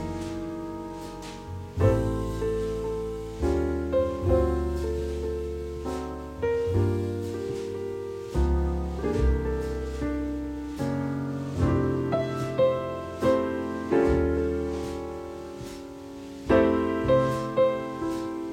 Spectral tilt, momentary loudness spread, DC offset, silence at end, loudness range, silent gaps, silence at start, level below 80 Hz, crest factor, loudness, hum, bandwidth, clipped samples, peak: -7.5 dB/octave; 13 LU; under 0.1%; 0 s; 3 LU; none; 0 s; -36 dBFS; 18 dB; -28 LUFS; none; 16 kHz; under 0.1%; -8 dBFS